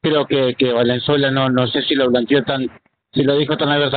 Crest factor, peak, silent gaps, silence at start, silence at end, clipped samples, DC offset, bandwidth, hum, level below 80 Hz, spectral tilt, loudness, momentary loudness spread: 14 dB; -2 dBFS; none; 0.05 s; 0 s; under 0.1%; under 0.1%; 4.7 kHz; none; -54 dBFS; -4 dB/octave; -17 LUFS; 5 LU